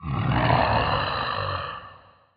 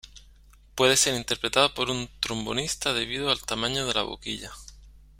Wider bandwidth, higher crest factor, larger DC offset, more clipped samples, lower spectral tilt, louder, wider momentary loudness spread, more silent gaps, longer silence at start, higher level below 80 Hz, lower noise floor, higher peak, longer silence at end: second, 5.2 kHz vs 16.5 kHz; second, 18 dB vs 24 dB; neither; neither; first, -4 dB/octave vs -2 dB/octave; about the same, -24 LUFS vs -25 LUFS; about the same, 12 LU vs 13 LU; neither; about the same, 0 s vs 0.05 s; first, -40 dBFS vs -50 dBFS; second, -50 dBFS vs -54 dBFS; about the same, -6 dBFS vs -4 dBFS; first, 0.4 s vs 0.2 s